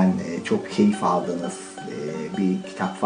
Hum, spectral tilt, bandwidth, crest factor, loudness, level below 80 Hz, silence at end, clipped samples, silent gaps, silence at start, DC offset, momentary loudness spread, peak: none; -6.5 dB/octave; 10 kHz; 16 dB; -25 LUFS; -66 dBFS; 0 s; under 0.1%; none; 0 s; under 0.1%; 12 LU; -6 dBFS